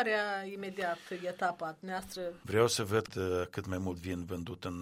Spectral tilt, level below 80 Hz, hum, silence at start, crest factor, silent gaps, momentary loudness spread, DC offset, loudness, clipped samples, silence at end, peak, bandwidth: -4.5 dB/octave; -62 dBFS; none; 0 s; 22 dB; none; 11 LU; under 0.1%; -35 LUFS; under 0.1%; 0 s; -12 dBFS; 16 kHz